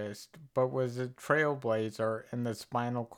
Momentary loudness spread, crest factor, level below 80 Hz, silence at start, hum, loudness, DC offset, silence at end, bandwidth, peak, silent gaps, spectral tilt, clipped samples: 9 LU; 20 dB; -76 dBFS; 0 s; none; -33 LUFS; under 0.1%; 0 s; 17.5 kHz; -14 dBFS; none; -6.5 dB/octave; under 0.1%